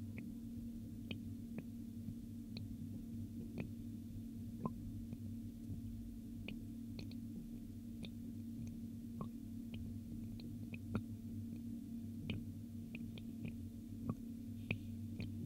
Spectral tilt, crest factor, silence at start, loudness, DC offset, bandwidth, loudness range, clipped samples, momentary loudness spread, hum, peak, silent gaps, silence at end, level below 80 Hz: -7 dB/octave; 22 dB; 0 s; -49 LUFS; under 0.1%; 16 kHz; 2 LU; under 0.1%; 4 LU; none; -24 dBFS; none; 0 s; -60 dBFS